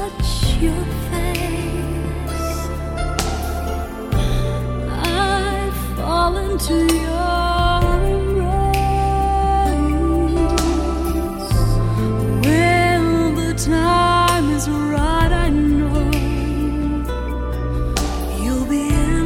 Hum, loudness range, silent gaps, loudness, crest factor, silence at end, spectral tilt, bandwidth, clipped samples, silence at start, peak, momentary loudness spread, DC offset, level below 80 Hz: none; 6 LU; none; -19 LUFS; 16 dB; 0 s; -5.5 dB/octave; 16.5 kHz; under 0.1%; 0 s; -2 dBFS; 8 LU; under 0.1%; -22 dBFS